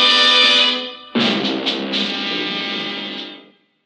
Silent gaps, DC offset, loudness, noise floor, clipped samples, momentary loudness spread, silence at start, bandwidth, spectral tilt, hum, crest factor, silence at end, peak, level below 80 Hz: none; under 0.1%; -16 LUFS; -47 dBFS; under 0.1%; 16 LU; 0 s; 11 kHz; -2.5 dB/octave; none; 16 dB; 0.45 s; -2 dBFS; -72 dBFS